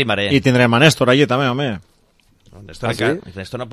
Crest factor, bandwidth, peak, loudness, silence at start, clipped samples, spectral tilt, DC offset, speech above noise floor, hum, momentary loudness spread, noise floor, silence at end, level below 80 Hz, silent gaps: 18 dB; 14.5 kHz; 0 dBFS; -15 LUFS; 0 s; under 0.1%; -5.5 dB/octave; under 0.1%; 40 dB; none; 15 LU; -56 dBFS; 0 s; -46 dBFS; none